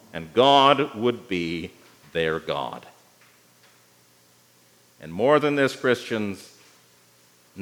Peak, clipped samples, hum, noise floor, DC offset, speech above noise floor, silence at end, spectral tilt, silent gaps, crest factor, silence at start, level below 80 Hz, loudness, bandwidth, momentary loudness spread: -2 dBFS; under 0.1%; 60 Hz at -60 dBFS; -58 dBFS; under 0.1%; 36 dB; 0 s; -5 dB/octave; none; 22 dB; 0.15 s; -66 dBFS; -22 LUFS; over 20 kHz; 20 LU